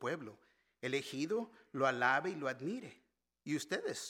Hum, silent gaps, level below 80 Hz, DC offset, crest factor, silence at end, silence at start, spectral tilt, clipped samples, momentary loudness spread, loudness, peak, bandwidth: none; none; -86 dBFS; under 0.1%; 22 dB; 0 s; 0 s; -4 dB/octave; under 0.1%; 14 LU; -38 LUFS; -16 dBFS; 17 kHz